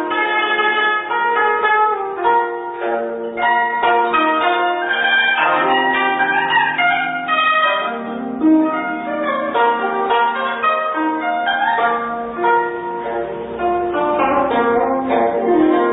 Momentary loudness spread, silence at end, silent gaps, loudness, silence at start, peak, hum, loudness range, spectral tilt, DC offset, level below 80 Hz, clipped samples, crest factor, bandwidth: 8 LU; 0 s; none; -16 LUFS; 0 s; -4 dBFS; none; 3 LU; -9 dB/octave; under 0.1%; -54 dBFS; under 0.1%; 12 dB; 4 kHz